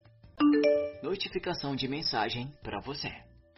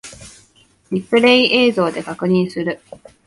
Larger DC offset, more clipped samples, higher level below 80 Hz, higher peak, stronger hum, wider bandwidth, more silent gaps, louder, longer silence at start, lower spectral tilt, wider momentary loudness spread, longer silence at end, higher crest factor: neither; neither; about the same, -58 dBFS vs -56 dBFS; second, -14 dBFS vs 0 dBFS; neither; second, 6 kHz vs 11.5 kHz; neither; second, -31 LUFS vs -16 LUFS; first, 0.25 s vs 0.05 s; second, -3.5 dB/octave vs -5.5 dB/octave; about the same, 14 LU vs 14 LU; second, 0.35 s vs 0.5 s; about the same, 16 dB vs 18 dB